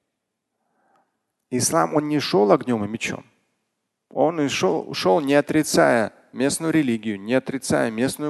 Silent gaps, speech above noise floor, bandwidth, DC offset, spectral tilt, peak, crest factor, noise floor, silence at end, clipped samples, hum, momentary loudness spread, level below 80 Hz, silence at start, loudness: none; 58 dB; 12.5 kHz; under 0.1%; -4.5 dB/octave; -2 dBFS; 20 dB; -79 dBFS; 0 s; under 0.1%; none; 9 LU; -58 dBFS; 1.5 s; -21 LUFS